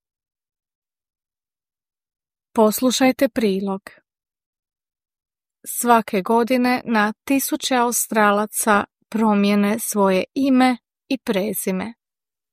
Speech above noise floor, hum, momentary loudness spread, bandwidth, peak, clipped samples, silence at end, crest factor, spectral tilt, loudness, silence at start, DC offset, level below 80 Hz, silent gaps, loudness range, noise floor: over 71 dB; none; 11 LU; 15.5 kHz; -2 dBFS; under 0.1%; 0.6 s; 18 dB; -4 dB/octave; -19 LUFS; 2.55 s; under 0.1%; -64 dBFS; 4.46-4.53 s; 5 LU; under -90 dBFS